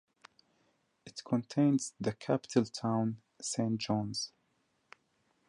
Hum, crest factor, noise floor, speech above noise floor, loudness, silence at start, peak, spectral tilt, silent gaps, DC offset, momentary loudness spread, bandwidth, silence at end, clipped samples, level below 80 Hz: none; 20 dB; -76 dBFS; 44 dB; -34 LUFS; 1.05 s; -14 dBFS; -5.5 dB/octave; none; under 0.1%; 11 LU; 11.5 kHz; 1.2 s; under 0.1%; -70 dBFS